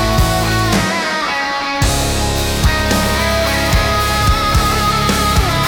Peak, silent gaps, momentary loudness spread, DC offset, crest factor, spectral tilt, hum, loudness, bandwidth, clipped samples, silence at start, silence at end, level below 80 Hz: -2 dBFS; none; 3 LU; under 0.1%; 12 dB; -4 dB/octave; none; -14 LUFS; 18 kHz; under 0.1%; 0 s; 0 s; -20 dBFS